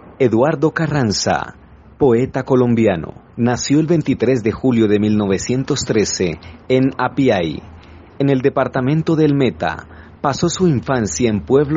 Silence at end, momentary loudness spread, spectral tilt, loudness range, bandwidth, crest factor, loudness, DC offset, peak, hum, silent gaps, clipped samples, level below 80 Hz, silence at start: 0 s; 7 LU; -6 dB/octave; 2 LU; 8 kHz; 16 dB; -17 LUFS; under 0.1%; 0 dBFS; none; none; under 0.1%; -44 dBFS; 0.05 s